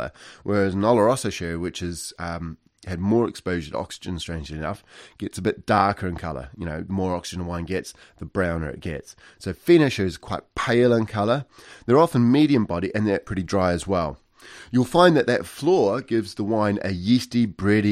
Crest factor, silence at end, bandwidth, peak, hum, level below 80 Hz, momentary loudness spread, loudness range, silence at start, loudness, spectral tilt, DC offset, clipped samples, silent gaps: 20 dB; 0 s; 15 kHz; -4 dBFS; none; -46 dBFS; 16 LU; 7 LU; 0 s; -23 LUFS; -6 dB/octave; under 0.1%; under 0.1%; none